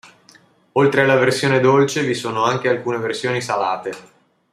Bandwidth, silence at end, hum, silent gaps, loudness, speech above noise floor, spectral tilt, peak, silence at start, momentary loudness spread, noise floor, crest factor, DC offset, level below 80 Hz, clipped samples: 14 kHz; 0.5 s; none; none; -18 LUFS; 34 dB; -5 dB/octave; -2 dBFS; 0.75 s; 9 LU; -51 dBFS; 16 dB; under 0.1%; -62 dBFS; under 0.1%